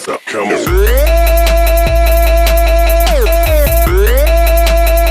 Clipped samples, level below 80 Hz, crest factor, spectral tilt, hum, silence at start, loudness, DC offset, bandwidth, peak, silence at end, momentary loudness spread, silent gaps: under 0.1%; -10 dBFS; 8 dB; -5 dB/octave; none; 0 s; -11 LUFS; under 0.1%; 16 kHz; 0 dBFS; 0 s; 2 LU; none